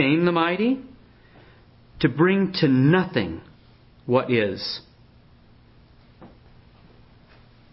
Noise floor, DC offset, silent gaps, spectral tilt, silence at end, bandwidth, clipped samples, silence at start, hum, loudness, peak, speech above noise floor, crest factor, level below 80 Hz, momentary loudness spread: -53 dBFS; under 0.1%; none; -10.5 dB/octave; 1.45 s; 5.8 kHz; under 0.1%; 0 s; none; -22 LUFS; -6 dBFS; 32 dB; 18 dB; -54 dBFS; 13 LU